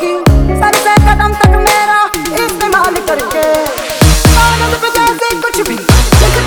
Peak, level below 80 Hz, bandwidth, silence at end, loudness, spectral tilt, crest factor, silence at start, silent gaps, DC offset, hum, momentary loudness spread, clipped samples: 0 dBFS; -14 dBFS; over 20 kHz; 0 s; -10 LUFS; -4.5 dB/octave; 8 dB; 0 s; none; under 0.1%; none; 6 LU; 1%